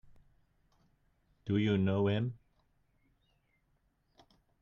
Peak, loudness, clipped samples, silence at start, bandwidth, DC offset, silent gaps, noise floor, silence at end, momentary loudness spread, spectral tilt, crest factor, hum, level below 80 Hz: -18 dBFS; -32 LUFS; under 0.1%; 1.45 s; 7 kHz; under 0.1%; none; -75 dBFS; 2.25 s; 10 LU; -9 dB/octave; 20 dB; none; -68 dBFS